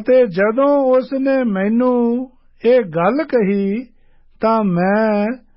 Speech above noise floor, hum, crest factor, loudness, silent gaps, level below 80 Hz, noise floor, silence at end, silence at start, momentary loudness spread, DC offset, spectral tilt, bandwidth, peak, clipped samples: 33 dB; none; 12 dB; -16 LUFS; none; -56 dBFS; -48 dBFS; 0.2 s; 0 s; 7 LU; under 0.1%; -12.5 dB/octave; 5.8 kHz; -4 dBFS; under 0.1%